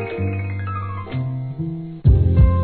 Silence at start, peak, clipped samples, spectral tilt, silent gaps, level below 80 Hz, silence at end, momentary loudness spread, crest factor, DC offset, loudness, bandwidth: 0 s; -2 dBFS; under 0.1%; -12.5 dB/octave; none; -24 dBFS; 0 s; 12 LU; 16 dB; 0.3%; -21 LUFS; 4.4 kHz